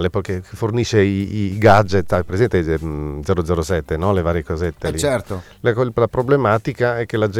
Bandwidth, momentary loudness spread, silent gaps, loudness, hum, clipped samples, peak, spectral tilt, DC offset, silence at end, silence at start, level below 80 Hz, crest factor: 15.5 kHz; 8 LU; none; -18 LUFS; none; under 0.1%; -2 dBFS; -6.5 dB/octave; under 0.1%; 0 s; 0 s; -36 dBFS; 16 dB